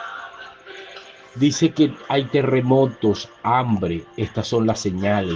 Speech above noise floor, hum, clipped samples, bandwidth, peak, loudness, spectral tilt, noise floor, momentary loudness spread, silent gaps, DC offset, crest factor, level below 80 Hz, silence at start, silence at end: 22 dB; none; under 0.1%; 9.4 kHz; -4 dBFS; -20 LUFS; -6 dB/octave; -41 dBFS; 20 LU; none; under 0.1%; 18 dB; -54 dBFS; 0 s; 0 s